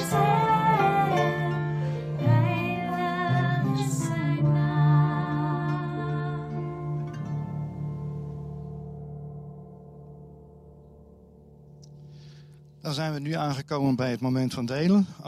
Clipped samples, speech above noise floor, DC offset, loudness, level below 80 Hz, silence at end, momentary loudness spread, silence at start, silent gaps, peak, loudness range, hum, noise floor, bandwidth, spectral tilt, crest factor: under 0.1%; 26 dB; under 0.1%; -26 LUFS; -56 dBFS; 0 s; 18 LU; 0 s; none; -10 dBFS; 18 LU; none; -51 dBFS; 14.5 kHz; -7 dB/octave; 16 dB